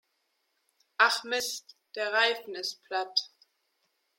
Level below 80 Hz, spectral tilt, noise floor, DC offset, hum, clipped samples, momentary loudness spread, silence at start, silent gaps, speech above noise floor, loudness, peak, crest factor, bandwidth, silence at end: -84 dBFS; 1 dB/octave; -77 dBFS; under 0.1%; none; under 0.1%; 17 LU; 1 s; none; 47 dB; -28 LUFS; -8 dBFS; 24 dB; 16.5 kHz; 0.9 s